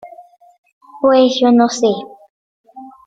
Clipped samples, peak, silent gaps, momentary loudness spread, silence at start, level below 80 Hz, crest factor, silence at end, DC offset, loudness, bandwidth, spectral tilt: under 0.1%; -2 dBFS; 0.58-0.63 s, 0.72-0.81 s, 2.30-2.64 s; 11 LU; 0.05 s; -62 dBFS; 14 dB; 0.15 s; under 0.1%; -13 LUFS; 7.8 kHz; -4.5 dB/octave